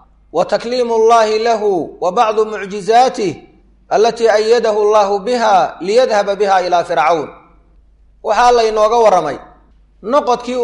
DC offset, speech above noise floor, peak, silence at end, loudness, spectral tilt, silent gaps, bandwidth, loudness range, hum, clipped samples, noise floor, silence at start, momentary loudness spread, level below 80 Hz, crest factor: under 0.1%; 35 dB; -2 dBFS; 0 s; -13 LUFS; -3.5 dB/octave; none; 11 kHz; 2 LU; none; under 0.1%; -47 dBFS; 0.35 s; 10 LU; -46 dBFS; 12 dB